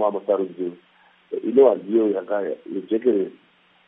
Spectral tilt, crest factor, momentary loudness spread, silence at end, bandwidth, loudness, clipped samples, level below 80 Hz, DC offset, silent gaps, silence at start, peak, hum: -10.5 dB/octave; 18 dB; 15 LU; 0.55 s; 3.8 kHz; -22 LUFS; under 0.1%; -84 dBFS; under 0.1%; none; 0 s; -4 dBFS; none